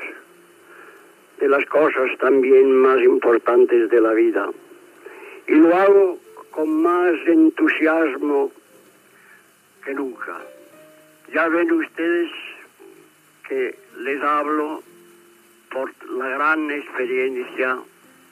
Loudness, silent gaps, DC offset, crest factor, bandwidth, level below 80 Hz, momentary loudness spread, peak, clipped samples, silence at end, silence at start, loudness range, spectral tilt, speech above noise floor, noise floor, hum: -18 LUFS; none; under 0.1%; 14 dB; 13.5 kHz; -84 dBFS; 18 LU; -6 dBFS; under 0.1%; 0.5 s; 0 s; 10 LU; -5.5 dB/octave; 35 dB; -53 dBFS; none